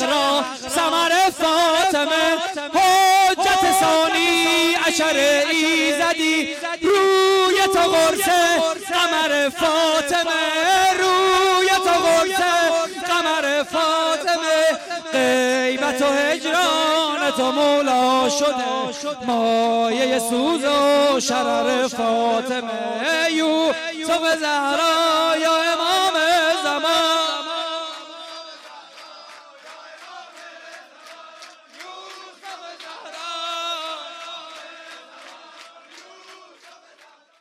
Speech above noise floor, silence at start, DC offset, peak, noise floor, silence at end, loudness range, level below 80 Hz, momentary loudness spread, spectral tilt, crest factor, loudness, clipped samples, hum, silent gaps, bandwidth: 34 dB; 0 s; under 0.1%; -10 dBFS; -52 dBFS; 1.05 s; 15 LU; -58 dBFS; 18 LU; -1.5 dB/octave; 10 dB; -18 LUFS; under 0.1%; none; none; 16.5 kHz